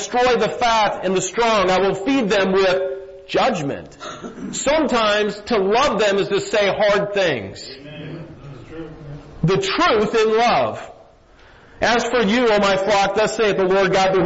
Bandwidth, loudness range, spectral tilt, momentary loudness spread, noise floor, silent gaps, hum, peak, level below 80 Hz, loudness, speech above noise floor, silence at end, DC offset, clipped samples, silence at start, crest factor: 8 kHz; 4 LU; -4 dB/octave; 18 LU; -48 dBFS; none; none; -6 dBFS; -46 dBFS; -18 LUFS; 30 dB; 0 s; under 0.1%; under 0.1%; 0 s; 12 dB